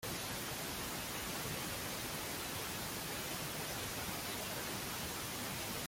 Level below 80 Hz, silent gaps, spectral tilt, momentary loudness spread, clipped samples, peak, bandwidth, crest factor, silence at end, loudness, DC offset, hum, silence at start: -60 dBFS; none; -2.5 dB/octave; 1 LU; under 0.1%; -28 dBFS; 17 kHz; 14 dB; 0 s; -40 LUFS; under 0.1%; none; 0 s